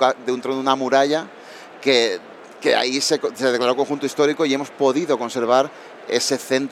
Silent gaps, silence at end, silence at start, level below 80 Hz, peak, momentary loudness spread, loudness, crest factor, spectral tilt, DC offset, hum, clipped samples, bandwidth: none; 0 s; 0 s; -78 dBFS; -2 dBFS; 7 LU; -20 LUFS; 18 dB; -3 dB/octave; under 0.1%; none; under 0.1%; 15 kHz